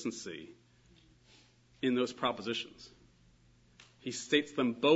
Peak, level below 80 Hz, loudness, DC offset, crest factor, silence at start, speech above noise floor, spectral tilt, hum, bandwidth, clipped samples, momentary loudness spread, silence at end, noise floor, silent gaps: -14 dBFS; -72 dBFS; -34 LUFS; under 0.1%; 22 dB; 0 s; 32 dB; -2.5 dB/octave; none; 7.6 kHz; under 0.1%; 19 LU; 0 s; -65 dBFS; none